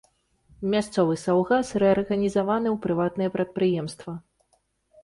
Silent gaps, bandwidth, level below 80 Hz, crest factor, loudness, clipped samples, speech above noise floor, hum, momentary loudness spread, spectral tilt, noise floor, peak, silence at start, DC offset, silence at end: none; 11.5 kHz; -58 dBFS; 16 dB; -24 LUFS; under 0.1%; 45 dB; none; 11 LU; -6.5 dB/octave; -69 dBFS; -10 dBFS; 0.6 s; under 0.1%; 0.85 s